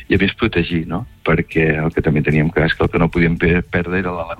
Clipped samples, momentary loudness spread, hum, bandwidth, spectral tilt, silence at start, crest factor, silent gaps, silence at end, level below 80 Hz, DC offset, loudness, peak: under 0.1%; 5 LU; none; 5 kHz; -8.5 dB/octave; 0 s; 14 dB; none; 0.05 s; -32 dBFS; under 0.1%; -17 LUFS; -2 dBFS